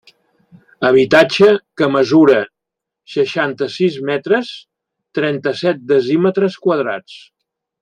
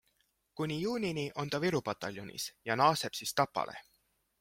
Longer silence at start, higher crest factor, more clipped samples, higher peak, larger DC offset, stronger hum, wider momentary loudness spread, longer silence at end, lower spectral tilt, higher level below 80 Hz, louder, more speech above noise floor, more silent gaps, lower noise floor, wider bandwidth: first, 0.8 s vs 0.55 s; second, 16 dB vs 22 dB; neither; first, 0 dBFS vs -12 dBFS; neither; neither; about the same, 12 LU vs 12 LU; about the same, 0.65 s vs 0.6 s; first, -6 dB/octave vs -4.5 dB/octave; first, -60 dBFS vs -70 dBFS; first, -15 LUFS vs -34 LUFS; first, 68 dB vs 42 dB; neither; first, -82 dBFS vs -76 dBFS; second, 9.8 kHz vs 16.5 kHz